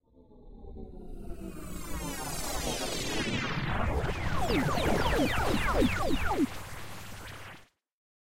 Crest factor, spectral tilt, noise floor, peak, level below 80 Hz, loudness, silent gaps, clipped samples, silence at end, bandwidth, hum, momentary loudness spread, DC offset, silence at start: 16 dB; -4.5 dB/octave; -54 dBFS; -14 dBFS; -40 dBFS; -31 LUFS; none; under 0.1%; 0.4 s; 16 kHz; none; 19 LU; 0.6%; 0 s